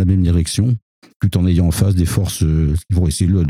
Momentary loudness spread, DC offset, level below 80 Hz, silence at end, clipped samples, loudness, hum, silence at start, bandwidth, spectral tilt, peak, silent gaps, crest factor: 4 LU; under 0.1%; -26 dBFS; 0 s; under 0.1%; -17 LUFS; none; 0 s; 15.5 kHz; -6.5 dB/octave; -4 dBFS; 0.82-1.02 s, 1.16-1.20 s; 12 dB